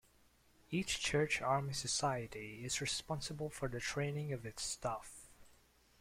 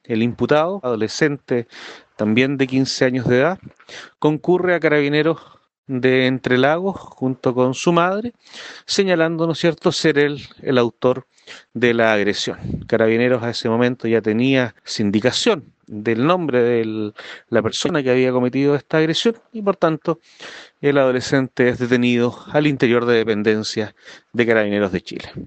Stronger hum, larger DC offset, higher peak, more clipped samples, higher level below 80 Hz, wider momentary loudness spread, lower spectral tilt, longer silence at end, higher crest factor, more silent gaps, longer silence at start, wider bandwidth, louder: neither; neither; second, -22 dBFS vs 0 dBFS; neither; second, -62 dBFS vs -54 dBFS; about the same, 10 LU vs 12 LU; second, -3.5 dB/octave vs -5.5 dB/octave; first, 0.5 s vs 0 s; about the same, 18 dB vs 18 dB; second, none vs 5.78-5.83 s; first, 0.7 s vs 0.1 s; first, 16 kHz vs 8.8 kHz; second, -39 LUFS vs -18 LUFS